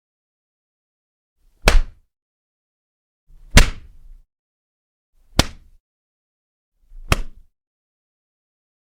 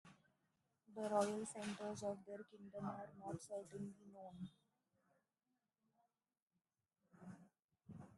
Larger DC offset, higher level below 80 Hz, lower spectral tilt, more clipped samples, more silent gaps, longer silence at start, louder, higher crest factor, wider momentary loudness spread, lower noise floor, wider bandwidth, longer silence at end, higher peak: neither; first, -26 dBFS vs -86 dBFS; second, -3.5 dB/octave vs -5.5 dB/octave; neither; first, 2.22-3.27 s, 4.39-5.13 s, 5.80-6.72 s vs 6.42-6.47 s, 7.64-7.69 s; first, 1.65 s vs 0.05 s; first, -20 LUFS vs -48 LUFS; about the same, 24 dB vs 26 dB; second, 12 LU vs 20 LU; second, -42 dBFS vs under -90 dBFS; first, 17 kHz vs 12 kHz; first, 1.5 s vs 0 s; first, 0 dBFS vs -26 dBFS